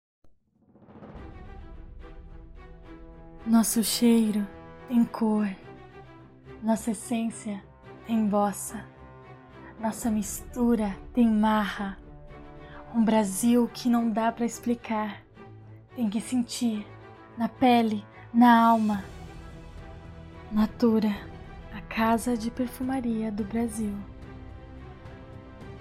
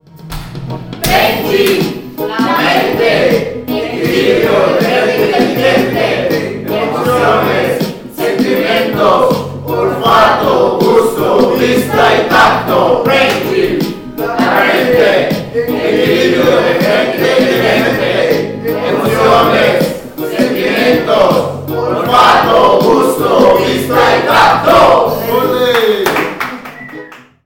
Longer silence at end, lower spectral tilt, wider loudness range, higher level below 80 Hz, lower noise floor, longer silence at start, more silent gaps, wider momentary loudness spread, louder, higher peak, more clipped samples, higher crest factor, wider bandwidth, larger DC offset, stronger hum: second, 0 s vs 0.3 s; about the same, -5 dB/octave vs -5 dB/octave; first, 6 LU vs 3 LU; second, -50 dBFS vs -38 dBFS; first, -61 dBFS vs -31 dBFS; about the same, 0.25 s vs 0.15 s; neither; first, 24 LU vs 10 LU; second, -26 LUFS vs -10 LUFS; second, -8 dBFS vs 0 dBFS; neither; first, 20 dB vs 10 dB; about the same, 16 kHz vs 17 kHz; neither; neither